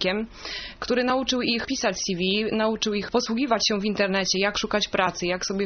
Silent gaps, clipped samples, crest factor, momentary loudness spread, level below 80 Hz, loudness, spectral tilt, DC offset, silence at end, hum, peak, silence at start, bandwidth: none; under 0.1%; 18 dB; 5 LU; -50 dBFS; -24 LUFS; -2.5 dB/octave; under 0.1%; 0 s; none; -6 dBFS; 0 s; 6.8 kHz